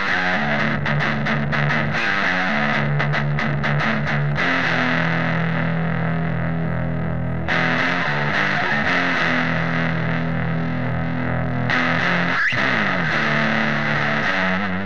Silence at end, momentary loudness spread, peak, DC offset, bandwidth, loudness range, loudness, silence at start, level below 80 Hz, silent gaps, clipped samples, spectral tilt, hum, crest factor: 0 s; 5 LU; -4 dBFS; 4%; 7.2 kHz; 2 LU; -20 LUFS; 0 s; -44 dBFS; none; under 0.1%; -6.5 dB/octave; none; 18 dB